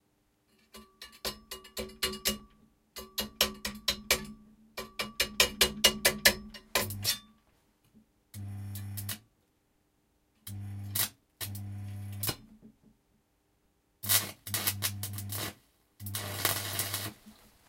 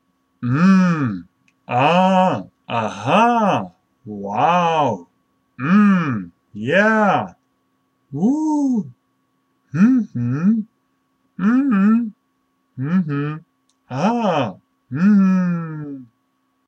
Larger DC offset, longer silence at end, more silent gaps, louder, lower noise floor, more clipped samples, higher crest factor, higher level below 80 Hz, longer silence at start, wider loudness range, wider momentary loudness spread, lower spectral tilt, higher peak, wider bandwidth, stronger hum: neither; second, 0.35 s vs 0.65 s; neither; second, -31 LUFS vs -18 LUFS; first, -73 dBFS vs -67 dBFS; neither; first, 30 dB vs 16 dB; first, -56 dBFS vs -64 dBFS; first, 0.75 s vs 0.4 s; first, 11 LU vs 3 LU; first, 20 LU vs 16 LU; second, -1.5 dB/octave vs -7.5 dB/octave; second, -6 dBFS vs -2 dBFS; first, 17 kHz vs 8.2 kHz; neither